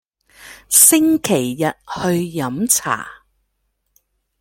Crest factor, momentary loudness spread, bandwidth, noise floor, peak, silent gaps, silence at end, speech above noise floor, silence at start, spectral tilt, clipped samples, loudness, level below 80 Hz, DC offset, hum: 18 dB; 14 LU; 17 kHz; -70 dBFS; 0 dBFS; none; 1.25 s; 53 dB; 0.4 s; -3 dB/octave; under 0.1%; -15 LUFS; -56 dBFS; under 0.1%; none